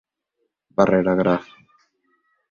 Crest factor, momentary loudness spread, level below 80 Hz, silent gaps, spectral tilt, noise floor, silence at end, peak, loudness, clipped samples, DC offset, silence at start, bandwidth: 22 dB; 8 LU; -54 dBFS; none; -8 dB/octave; -75 dBFS; 1.1 s; -2 dBFS; -20 LUFS; under 0.1%; under 0.1%; 0.8 s; 6.8 kHz